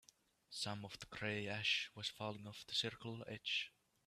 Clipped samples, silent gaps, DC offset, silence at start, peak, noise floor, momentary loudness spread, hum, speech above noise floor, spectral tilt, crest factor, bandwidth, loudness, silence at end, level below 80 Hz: under 0.1%; none; under 0.1%; 0.5 s; -26 dBFS; -69 dBFS; 13 LU; none; 24 dB; -3 dB/octave; 20 dB; 14.5 kHz; -43 LUFS; 0.4 s; -76 dBFS